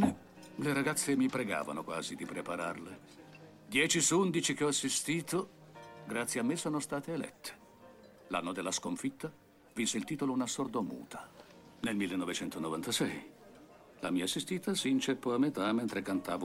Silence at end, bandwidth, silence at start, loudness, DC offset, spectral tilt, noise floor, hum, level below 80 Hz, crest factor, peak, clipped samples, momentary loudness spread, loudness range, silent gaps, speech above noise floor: 0 s; 16.5 kHz; 0 s; -34 LUFS; under 0.1%; -3.5 dB/octave; -57 dBFS; none; -72 dBFS; 18 dB; -16 dBFS; under 0.1%; 17 LU; 6 LU; none; 23 dB